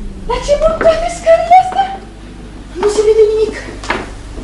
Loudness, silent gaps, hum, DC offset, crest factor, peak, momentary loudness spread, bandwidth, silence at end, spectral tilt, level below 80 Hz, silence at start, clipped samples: -12 LUFS; none; 50 Hz at -35 dBFS; under 0.1%; 12 dB; 0 dBFS; 20 LU; 11.5 kHz; 0 s; -4.5 dB/octave; -28 dBFS; 0 s; under 0.1%